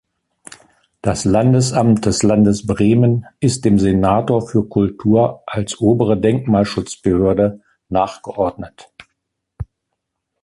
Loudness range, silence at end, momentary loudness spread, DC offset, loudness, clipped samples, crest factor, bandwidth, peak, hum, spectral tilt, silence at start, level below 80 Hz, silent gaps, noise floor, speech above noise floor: 6 LU; 0.8 s; 10 LU; under 0.1%; -16 LUFS; under 0.1%; 14 dB; 11.5 kHz; -2 dBFS; none; -6.5 dB/octave; 1.05 s; -40 dBFS; none; -76 dBFS; 61 dB